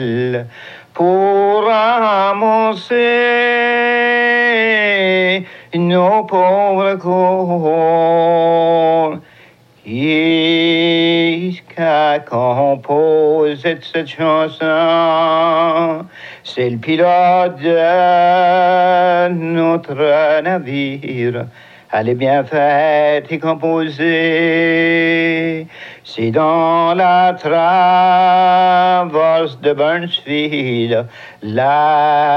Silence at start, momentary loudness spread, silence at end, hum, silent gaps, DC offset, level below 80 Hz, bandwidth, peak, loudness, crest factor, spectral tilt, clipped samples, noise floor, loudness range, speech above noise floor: 0 s; 9 LU; 0 s; none; none; under 0.1%; -68 dBFS; 6.6 kHz; -2 dBFS; -13 LUFS; 12 dB; -7 dB/octave; under 0.1%; -46 dBFS; 3 LU; 32 dB